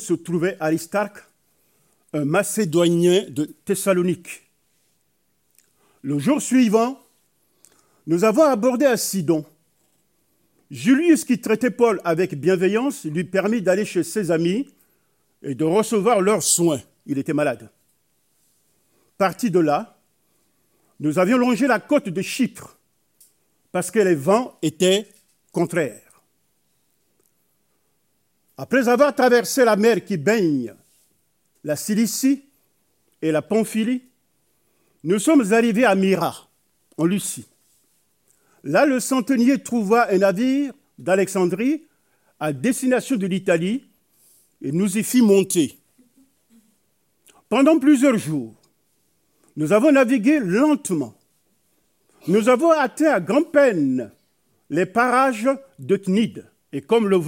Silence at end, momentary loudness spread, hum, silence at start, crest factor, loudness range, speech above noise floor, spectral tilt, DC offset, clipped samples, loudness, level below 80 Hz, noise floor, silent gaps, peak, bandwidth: 0 s; 13 LU; none; 0 s; 18 dB; 5 LU; 51 dB; -5 dB/octave; under 0.1%; under 0.1%; -20 LUFS; -74 dBFS; -69 dBFS; none; -4 dBFS; 16.5 kHz